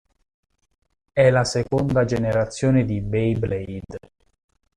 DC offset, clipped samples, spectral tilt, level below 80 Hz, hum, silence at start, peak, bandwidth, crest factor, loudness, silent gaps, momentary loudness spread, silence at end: under 0.1%; under 0.1%; -6.5 dB/octave; -44 dBFS; none; 1.15 s; -4 dBFS; 10.5 kHz; 18 dB; -21 LUFS; none; 15 LU; 0.8 s